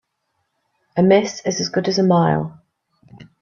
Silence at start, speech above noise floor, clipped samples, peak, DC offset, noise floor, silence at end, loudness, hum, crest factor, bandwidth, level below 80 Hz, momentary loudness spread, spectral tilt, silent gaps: 0.95 s; 56 dB; under 0.1%; -2 dBFS; under 0.1%; -72 dBFS; 0.2 s; -18 LUFS; none; 18 dB; 7.4 kHz; -60 dBFS; 9 LU; -5.5 dB/octave; none